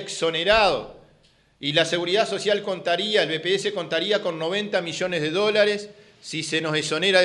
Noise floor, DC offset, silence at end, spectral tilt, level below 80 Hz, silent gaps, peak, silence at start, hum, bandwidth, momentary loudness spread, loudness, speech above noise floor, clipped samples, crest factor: -59 dBFS; under 0.1%; 0 s; -3.5 dB/octave; -54 dBFS; none; -2 dBFS; 0 s; none; 11.5 kHz; 11 LU; -23 LUFS; 36 dB; under 0.1%; 20 dB